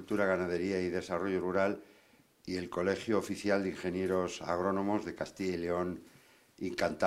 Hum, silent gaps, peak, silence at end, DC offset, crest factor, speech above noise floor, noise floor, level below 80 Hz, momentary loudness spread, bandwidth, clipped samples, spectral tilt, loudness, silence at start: none; none; -14 dBFS; 0 s; under 0.1%; 20 dB; 31 dB; -64 dBFS; -68 dBFS; 8 LU; 15.5 kHz; under 0.1%; -6 dB/octave; -34 LUFS; 0 s